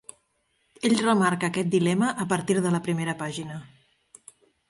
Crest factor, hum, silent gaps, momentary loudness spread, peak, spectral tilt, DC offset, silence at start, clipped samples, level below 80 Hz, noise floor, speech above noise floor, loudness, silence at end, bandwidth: 18 dB; none; none; 11 LU; -8 dBFS; -5.5 dB/octave; under 0.1%; 0.85 s; under 0.1%; -66 dBFS; -71 dBFS; 47 dB; -25 LUFS; 1.05 s; 11.5 kHz